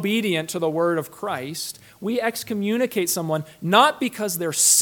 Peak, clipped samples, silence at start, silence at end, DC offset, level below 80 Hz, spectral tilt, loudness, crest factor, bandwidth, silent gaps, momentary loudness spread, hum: -2 dBFS; under 0.1%; 0 s; 0 s; under 0.1%; -68 dBFS; -3 dB/octave; -22 LUFS; 20 dB; 19 kHz; none; 12 LU; none